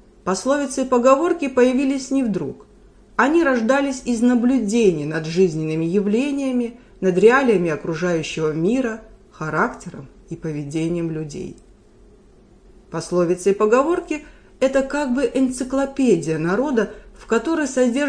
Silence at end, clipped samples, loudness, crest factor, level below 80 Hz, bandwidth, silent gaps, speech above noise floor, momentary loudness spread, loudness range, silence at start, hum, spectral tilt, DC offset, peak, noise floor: 0 s; under 0.1%; -20 LUFS; 20 dB; -48 dBFS; 10.5 kHz; none; 31 dB; 13 LU; 8 LU; 0.25 s; none; -6 dB/octave; under 0.1%; 0 dBFS; -49 dBFS